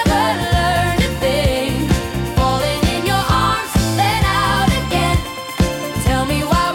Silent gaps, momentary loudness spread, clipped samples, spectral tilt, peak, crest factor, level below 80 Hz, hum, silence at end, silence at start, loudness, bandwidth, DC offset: none; 4 LU; under 0.1%; -5 dB/octave; -4 dBFS; 12 dB; -26 dBFS; none; 0 s; 0 s; -17 LUFS; 17.5 kHz; under 0.1%